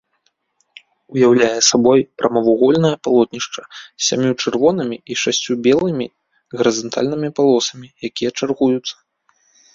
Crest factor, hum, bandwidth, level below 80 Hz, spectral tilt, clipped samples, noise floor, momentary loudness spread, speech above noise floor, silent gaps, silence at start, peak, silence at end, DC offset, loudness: 16 dB; none; 7.6 kHz; -58 dBFS; -4 dB/octave; under 0.1%; -66 dBFS; 13 LU; 50 dB; none; 1.1 s; 0 dBFS; 0.8 s; under 0.1%; -16 LUFS